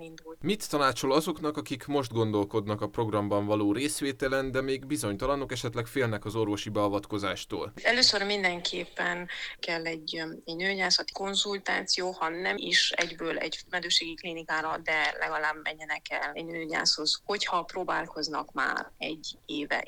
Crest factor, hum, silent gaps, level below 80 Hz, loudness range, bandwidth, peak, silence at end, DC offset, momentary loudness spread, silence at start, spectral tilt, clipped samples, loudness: 24 dB; none; none; -56 dBFS; 2 LU; 19.5 kHz; -6 dBFS; 0 s; under 0.1%; 10 LU; 0 s; -3 dB/octave; under 0.1%; -29 LUFS